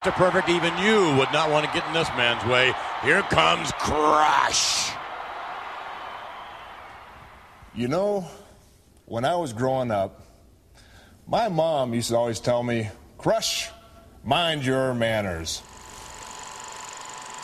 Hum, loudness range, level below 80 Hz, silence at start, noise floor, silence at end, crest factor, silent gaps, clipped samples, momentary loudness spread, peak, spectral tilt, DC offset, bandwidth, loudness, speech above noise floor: none; 11 LU; -52 dBFS; 0 s; -55 dBFS; 0 s; 22 dB; none; under 0.1%; 19 LU; -4 dBFS; -3.5 dB/octave; under 0.1%; 14 kHz; -23 LUFS; 32 dB